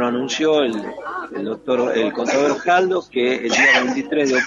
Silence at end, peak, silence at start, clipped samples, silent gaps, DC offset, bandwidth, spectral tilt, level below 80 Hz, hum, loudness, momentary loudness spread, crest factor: 0 s; -2 dBFS; 0 s; under 0.1%; none; under 0.1%; 7.8 kHz; -3 dB/octave; -62 dBFS; none; -18 LUFS; 13 LU; 16 dB